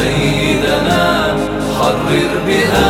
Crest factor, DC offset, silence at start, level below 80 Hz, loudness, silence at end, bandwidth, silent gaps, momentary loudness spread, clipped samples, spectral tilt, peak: 12 dB; under 0.1%; 0 s; -30 dBFS; -14 LUFS; 0 s; 18.5 kHz; none; 3 LU; under 0.1%; -5 dB/octave; 0 dBFS